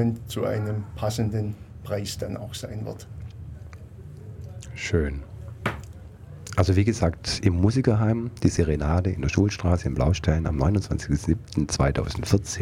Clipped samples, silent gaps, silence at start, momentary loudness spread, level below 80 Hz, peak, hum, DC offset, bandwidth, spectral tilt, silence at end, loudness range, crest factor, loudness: under 0.1%; none; 0 s; 19 LU; -36 dBFS; -6 dBFS; none; under 0.1%; 15 kHz; -6 dB/octave; 0 s; 10 LU; 20 dB; -25 LUFS